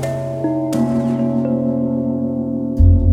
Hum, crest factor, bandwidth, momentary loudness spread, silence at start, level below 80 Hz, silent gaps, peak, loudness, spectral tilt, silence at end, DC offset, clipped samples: none; 14 dB; 12.5 kHz; 7 LU; 0 s; -26 dBFS; none; -2 dBFS; -18 LUFS; -9 dB/octave; 0 s; under 0.1%; under 0.1%